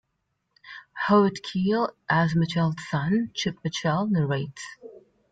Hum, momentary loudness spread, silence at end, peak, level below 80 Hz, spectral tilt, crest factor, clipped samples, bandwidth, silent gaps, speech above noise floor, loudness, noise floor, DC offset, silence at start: none; 19 LU; 0.35 s; -8 dBFS; -60 dBFS; -6 dB/octave; 18 dB; under 0.1%; 9 kHz; none; 52 dB; -25 LUFS; -77 dBFS; under 0.1%; 0.65 s